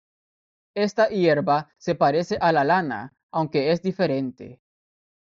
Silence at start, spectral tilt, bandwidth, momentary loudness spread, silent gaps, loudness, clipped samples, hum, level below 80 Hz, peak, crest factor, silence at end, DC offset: 0.75 s; -4.5 dB/octave; 7.6 kHz; 11 LU; 3.23-3.29 s; -23 LUFS; under 0.1%; none; -62 dBFS; -6 dBFS; 18 dB; 0.8 s; under 0.1%